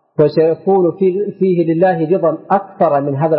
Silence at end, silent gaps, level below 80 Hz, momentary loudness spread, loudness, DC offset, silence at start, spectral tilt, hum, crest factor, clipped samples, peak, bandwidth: 0 s; none; -62 dBFS; 3 LU; -14 LUFS; under 0.1%; 0.2 s; -13.5 dB/octave; none; 12 dB; under 0.1%; -2 dBFS; 5.4 kHz